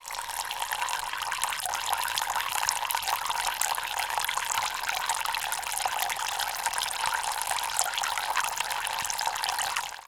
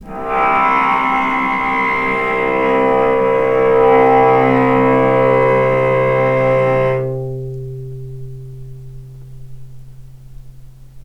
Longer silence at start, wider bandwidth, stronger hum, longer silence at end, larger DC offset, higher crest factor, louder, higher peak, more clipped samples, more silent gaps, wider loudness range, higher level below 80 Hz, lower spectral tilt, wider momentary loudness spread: about the same, 0 s vs 0 s; first, 19 kHz vs 8.4 kHz; neither; about the same, 0.05 s vs 0.05 s; neither; first, 28 dB vs 14 dB; second, -28 LUFS vs -13 LUFS; about the same, -2 dBFS vs 0 dBFS; neither; neither; second, 1 LU vs 16 LU; second, -58 dBFS vs -40 dBFS; second, 2 dB/octave vs -8 dB/octave; second, 3 LU vs 19 LU